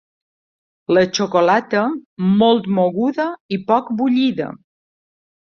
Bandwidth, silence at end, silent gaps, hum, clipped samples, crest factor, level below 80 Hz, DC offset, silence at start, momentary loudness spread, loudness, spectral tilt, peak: 7 kHz; 0.9 s; 2.06-2.17 s, 3.40-3.49 s; none; under 0.1%; 16 dB; -60 dBFS; under 0.1%; 0.9 s; 9 LU; -17 LUFS; -6 dB/octave; -2 dBFS